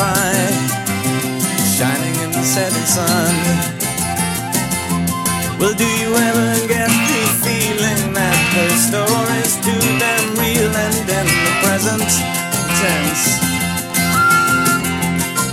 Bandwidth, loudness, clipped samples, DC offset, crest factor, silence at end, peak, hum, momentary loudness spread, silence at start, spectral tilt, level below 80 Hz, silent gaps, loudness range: 16.5 kHz; -15 LUFS; under 0.1%; under 0.1%; 16 dB; 0 s; 0 dBFS; none; 5 LU; 0 s; -3.5 dB/octave; -40 dBFS; none; 2 LU